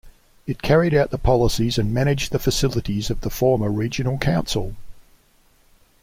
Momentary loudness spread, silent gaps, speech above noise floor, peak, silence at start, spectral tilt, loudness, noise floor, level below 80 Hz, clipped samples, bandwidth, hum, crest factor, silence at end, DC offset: 8 LU; none; 37 dB; -4 dBFS; 0.05 s; -5.5 dB/octave; -21 LUFS; -57 dBFS; -34 dBFS; under 0.1%; 16.5 kHz; none; 16 dB; 1 s; under 0.1%